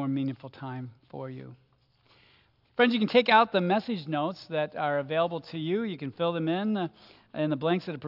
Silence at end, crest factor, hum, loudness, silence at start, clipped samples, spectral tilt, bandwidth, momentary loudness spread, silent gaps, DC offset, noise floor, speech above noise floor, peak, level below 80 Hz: 0 s; 22 dB; none; -28 LUFS; 0 s; under 0.1%; -8 dB/octave; 5.8 kHz; 19 LU; none; under 0.1%; -65 dBFS; 37 dB; -8 dBFS; -76 dBFS